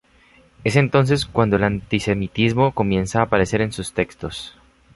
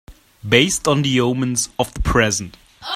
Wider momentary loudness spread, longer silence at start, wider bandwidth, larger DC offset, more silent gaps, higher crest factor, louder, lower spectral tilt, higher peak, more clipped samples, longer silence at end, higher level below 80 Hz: second, 9 LU vs 15 LU; first, 0.6 s vs 0.1 s; second, 11.5 kHz vs 16 kHz; neither; neither; about the same, 18 dB vs 20 dB; second, -20 LUFS vs -17 LUFS; first, -6 dB/octave vs -3.5 dB/octave; about the same, -2 dBFS vs 0 dBFS; neither; first, 0.45 s vs 0 s; second, -42 dBFS vs -32 dBFS